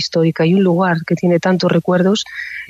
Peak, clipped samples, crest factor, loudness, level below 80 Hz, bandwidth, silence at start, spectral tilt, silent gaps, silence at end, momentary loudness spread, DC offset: -2 dBFS; under 0.1%; 12 dB; -15 LUFS; -58 dBFS; 7.8 kHz; 0 s; -6.5 dB/octave; none; 0.05 s; 3 LU; under 0.1%